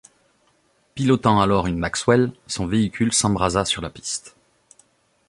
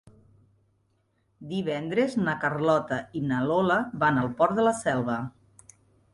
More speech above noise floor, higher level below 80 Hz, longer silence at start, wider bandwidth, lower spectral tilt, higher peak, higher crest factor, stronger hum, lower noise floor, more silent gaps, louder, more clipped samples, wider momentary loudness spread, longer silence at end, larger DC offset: about the same, 43 dB vs 45 dB; first, -44 dBFS vs -62 dBFS; second, 0.95 s vs 1.4 s; about the same, 11.5 kHz vs 11.5 kHz; second, -4.5 dB/octave vs -6 dB/octave; first, -2 dBFS vs -8 dBFS; about the same, 20 dB vs 18 dB; neither; second, -63 dBFS vs -70 dBFS; neither; first, -21 LUFS vs -26 LUFS; neither; first, 11 LU vs 8 LU; first, 1 s vs 0.85 s; neither